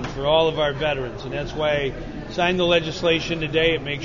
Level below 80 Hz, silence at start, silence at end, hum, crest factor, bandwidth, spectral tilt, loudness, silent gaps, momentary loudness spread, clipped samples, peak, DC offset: -40 dBFS; 0 s; 0 s; none; 18 dB; 7.4 kHz; -5 dB/octave; -22 LUFS; none; 10 LU; under 0.1%; -6 dBFS; 0.4%